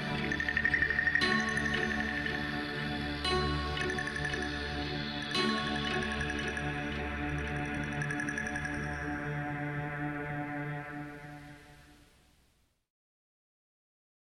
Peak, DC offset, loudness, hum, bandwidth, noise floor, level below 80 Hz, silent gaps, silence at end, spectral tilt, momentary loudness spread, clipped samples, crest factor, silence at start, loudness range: -16 dBFS; under 0.1%; -33 LUFS; none; 13.5 kHz; -71 dBFS; -48 dBFS; none; 2.3 s; -4.5 dB/octave; 9 LU; under 0.1%; 18 dB; 0 s; 11 LU